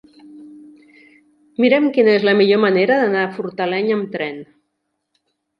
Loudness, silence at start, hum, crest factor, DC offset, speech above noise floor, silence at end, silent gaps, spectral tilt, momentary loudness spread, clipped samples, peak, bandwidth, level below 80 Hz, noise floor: -16 LUFS; 0.35 s; none; 16 dB; under 0.1%; 57 dB; 1.15 s; none; -7.5 dB/octave; 12 LU; under 0.1%; -2 dBFS; 5.4 kHz; -70 dBFS; -73 dBFS